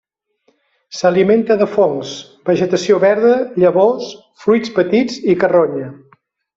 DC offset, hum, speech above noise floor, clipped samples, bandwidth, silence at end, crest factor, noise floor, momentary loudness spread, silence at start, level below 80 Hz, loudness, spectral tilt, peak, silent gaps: under 0.1%; none; 48 dB; under 0.1%; 7.8 kHz; 0.6 s; 14 dB; -62 dBFS; 12 LU; 0.9 s; -58 dBFS; -14 LUFS; -6 dB/octave; -2 dBFS; none